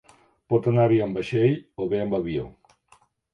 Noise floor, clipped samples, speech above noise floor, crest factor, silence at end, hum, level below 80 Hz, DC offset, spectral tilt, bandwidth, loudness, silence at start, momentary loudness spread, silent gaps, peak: -60 dBFS; under 0.1%; 38 dB; 16 dB; 0.85 s; none; -54 dBFS; under 0.1%; -9 dB/octave; 8.6 kHz; -24 LUFS; 0.5 s; 10 LU; none; -8 dBFS